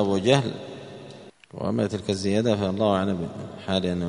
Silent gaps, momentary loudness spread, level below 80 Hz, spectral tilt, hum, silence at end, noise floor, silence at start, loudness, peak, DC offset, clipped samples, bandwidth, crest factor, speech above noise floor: none; 19 LU; -58 dBFS; -6 dB/octave; none; 0 s; -45 dBFS; 0 s; -25 LUFS; -2 dBFS; under 0.1%; under 0.1%; 10.5 kHz; 22 dB; 21 dB